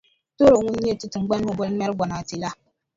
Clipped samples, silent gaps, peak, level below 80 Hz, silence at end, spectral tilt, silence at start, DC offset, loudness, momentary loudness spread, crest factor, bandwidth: under 0.1%; none; -4 dBFS; -50 dBFS; 0.4 s; -6 dB/octave; 0.4 s; under 0.1%; -22 LUFS; 14 LU; 18 dB; 7.8 kHz